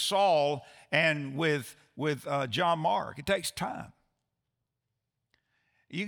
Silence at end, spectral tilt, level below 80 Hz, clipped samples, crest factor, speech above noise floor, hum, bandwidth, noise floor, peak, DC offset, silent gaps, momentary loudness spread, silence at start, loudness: 0 s; -4 dB/octave; -66 dBFS; under 0.1%; 22 dB; 56 dB; none; over 20 kHz; -85 dBFS; -10 dBFS; under 0.1%; none; 13 LU; 0 s; -29 LUFS